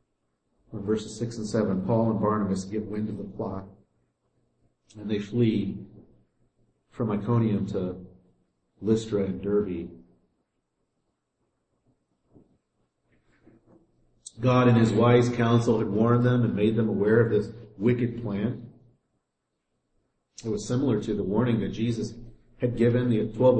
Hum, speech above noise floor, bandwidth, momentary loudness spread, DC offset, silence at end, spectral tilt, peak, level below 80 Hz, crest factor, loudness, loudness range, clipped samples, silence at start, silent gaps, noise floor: none; 56 dB; 8.8 kHz; 13 LU; under 0.1%; 0 s; -7.5 dB/octave; -8 dBFS; -54 dBFS; 18 dB; -26 LUFS; 10 LU; under 0.1%; 0.75 s; none; -80 dBFS